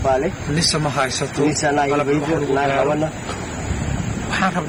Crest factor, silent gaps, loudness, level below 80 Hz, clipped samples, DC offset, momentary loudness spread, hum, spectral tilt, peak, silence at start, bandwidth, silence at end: 14 dB; none; -20 LUFS; -36 dBFS; under 0.1%; under 0.1%; 7 LU; none; -4.5 dB/octave; -6 dBFS; 0 s; over 20 kHz; 0 s